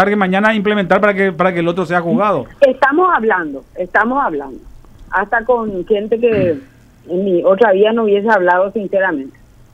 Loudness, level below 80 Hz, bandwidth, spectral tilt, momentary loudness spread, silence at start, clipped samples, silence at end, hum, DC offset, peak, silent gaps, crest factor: -14 LUFS; -44 dBFS; 9.4 kHz; -7.5 dB/octave; 9 LU; 0 s; under 0.1%; 0.45 s; none; under 0.1%; 0 dBFS; none; 14 dB